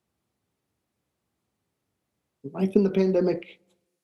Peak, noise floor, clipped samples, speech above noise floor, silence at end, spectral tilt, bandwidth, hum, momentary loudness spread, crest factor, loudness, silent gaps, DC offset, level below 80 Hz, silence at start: -6 dBFS; -80 dBFS; under 0.1%; 56 dB; 0.5 s; -9 dB/octave; 6.4 kHz; none; 16 LU; 22 dB; -24 LUFS; none; under 0.1%; -70 dBFS; 2.45 s